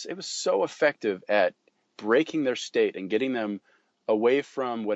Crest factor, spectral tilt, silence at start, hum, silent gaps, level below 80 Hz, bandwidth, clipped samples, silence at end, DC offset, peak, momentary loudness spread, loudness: 18 dB; -4 dB/octave; 0 s; none; none; -82 dBFS; 8.2 kHz; under 0.1%; 0 s; under 0.1%; -10 dBFS; 9 LU; -26 LUFS